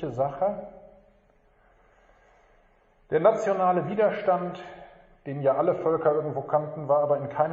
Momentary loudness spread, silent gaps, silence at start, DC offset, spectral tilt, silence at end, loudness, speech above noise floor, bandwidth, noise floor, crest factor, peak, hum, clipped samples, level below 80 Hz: 15 LU; none; 0 s; under 0.1%; -6.5 dB/octave; 0 s; -25 LUFS; 37 dB; 7.6 kHz; -62 dBFS; 20 dB; -8 dBFS; none; under 0.1%; -64 dBFS